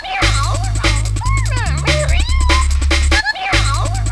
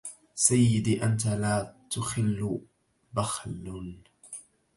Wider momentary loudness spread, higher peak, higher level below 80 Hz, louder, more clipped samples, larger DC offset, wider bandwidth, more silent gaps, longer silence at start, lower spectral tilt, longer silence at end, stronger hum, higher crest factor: second, 4 LU vs 20 LU; first, 0 dBFS vs -6 dBFS; first, -16 dBFS vs -54 dBFS; first, -15 LUFS vs -28 LUFS; neither; neither; about the same, 11 kHz vs 11.5 kHz; neither; about the same, 0 s vs 0.05 s; about the same, -4 dB/octave vs -5 dB/octave; second, 0 s vs 0.35 s; neither; second, 14 dB vs 22 dB